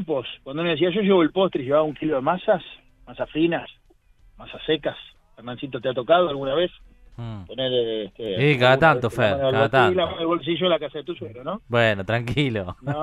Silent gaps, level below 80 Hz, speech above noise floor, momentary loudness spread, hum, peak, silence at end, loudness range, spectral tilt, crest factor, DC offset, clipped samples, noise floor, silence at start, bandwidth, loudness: none; -52 dBFS; 33 dB; 16 LU; none; -4 dBFS; 0 s; 6 LU; -7 dB/octave; 20 dB; under 0.1%; under 0.1%; -55 dBFS; 0 s; 12.5 kHz; -22 LUFS